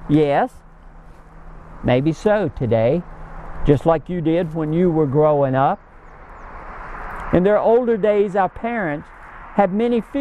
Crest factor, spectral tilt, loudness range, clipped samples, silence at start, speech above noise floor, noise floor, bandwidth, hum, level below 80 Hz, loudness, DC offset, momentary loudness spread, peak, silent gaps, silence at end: 18 dB; -8.5 dB/octave; 2 LU; under 0.1%; 0 s; 24 dB; -41 dBFS; 10 kHz; none; -38 dBFS; -18 LUFS; under 0.1%; 19 LU; -2 dBFS; none; 0 s